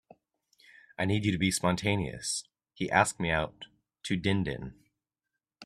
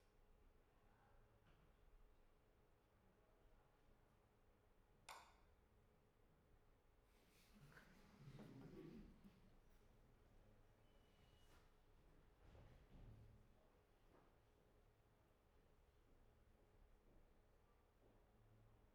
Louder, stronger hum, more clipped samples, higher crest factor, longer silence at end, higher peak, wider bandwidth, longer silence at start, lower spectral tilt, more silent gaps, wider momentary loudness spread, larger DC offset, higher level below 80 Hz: first, -30 LUFS vs -65 LUFS; neither; neither; about the same, 24 dB vs 26 dB; about the same, 0 s vs 0 s; first, -8 dBFS vs -44 dBFS; about the same, 14 kHz vs 13 kHz; first, 1 s vs 0 s; about the same, -4.5 dB/octave vs -5.5 dB/octave; neither; first, 18 LU vs 7 LU; neither; first, -56 dBFS vs -76 dBFS